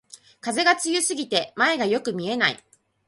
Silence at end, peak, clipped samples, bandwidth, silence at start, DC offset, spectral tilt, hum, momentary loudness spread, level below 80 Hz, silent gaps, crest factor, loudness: 0.5 s; -4 dBFS; under 0.1%; 12 kHz; 0.15 s; under 0.1%; -2 dB/octave; none; 8 LU; -70 dBFS; none; 20 dB; -22 LUFS